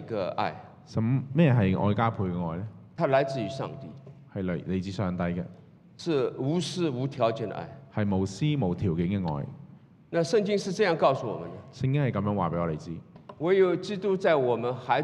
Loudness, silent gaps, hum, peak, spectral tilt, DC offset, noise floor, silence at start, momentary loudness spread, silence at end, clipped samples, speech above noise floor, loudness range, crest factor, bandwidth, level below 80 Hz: -28 LUFS; none; none; -10 dBFS; -7 dB/octave; under 0.1%; -51 dBFS; 0 s; 14 LU; 0 s; under 0.1%; 24 dB; 4 LU; 18 dB; 10.5 kHz; -62 dBFS